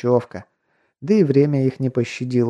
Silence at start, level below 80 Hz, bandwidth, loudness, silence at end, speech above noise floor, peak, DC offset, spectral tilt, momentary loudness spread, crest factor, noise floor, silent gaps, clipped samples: 0.05 s; -66 dBFS; 9.6 kHz; -19 LUFS; 0 s; 48 dB; -4 dBFS; under 0.1%; -8.5 dB/octave; 19 LU; 16 dB; -67 dBFS; none; under 0.1%